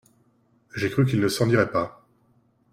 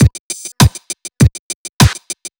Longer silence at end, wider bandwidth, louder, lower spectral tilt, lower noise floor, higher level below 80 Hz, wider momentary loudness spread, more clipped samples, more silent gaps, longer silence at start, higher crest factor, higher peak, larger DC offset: first, 0.85 s vs 0.1 s; second, 15.5 kHz vs over 20 kHz; second, -23 LUFS vs -13 LUFS; first, -6 dB/octave vs -4.5 dB/octave; first, -63 dBFS vs -30 dBFS; second, -58 dBFS vs -24 dBFS; second, 11 LU vs 14 LU; neither; second, none vs 0.19-0.30 s, 1.39-1.80 s; first, 0.75 s vs 0 s; about the same, 18 dB vs 14 dB; second, -6 dBFS vs 0 dBFS; neither